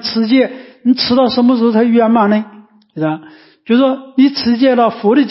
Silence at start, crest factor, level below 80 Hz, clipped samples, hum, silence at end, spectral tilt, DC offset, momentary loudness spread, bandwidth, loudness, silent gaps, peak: 0 s; 12 dB; -54 dBFS; under 0.1%; none; 0 s; -9 dB/octave; under 0.1%; 9 LU; 5.8 kHz; -13 LUFS; none; -2 dBFS